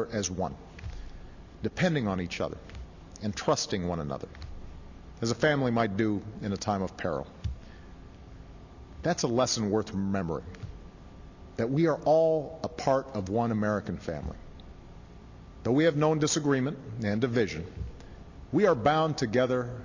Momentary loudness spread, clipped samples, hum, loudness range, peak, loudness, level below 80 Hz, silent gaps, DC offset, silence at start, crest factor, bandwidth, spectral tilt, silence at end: 24 LU; under 0.1%; none; 5 LU; -12 dBFS; -29 LUFS; -48 dBFS; none; under 0.1%; 0 s; 18 dB; 7.6 kHz; -5.5 dB/octave; 0 s